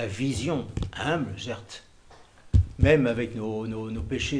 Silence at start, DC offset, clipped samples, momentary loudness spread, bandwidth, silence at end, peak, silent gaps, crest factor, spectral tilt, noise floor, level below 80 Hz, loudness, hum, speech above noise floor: 0 s; under 0.1%; under 0.1%; 14 LU; 10.5 kHz; 0 s; -6 dBFS; none; 20 dB; -6 dB/octave; -52 dBFS; -36 dBFS; -27 LUFS; none; 26 dB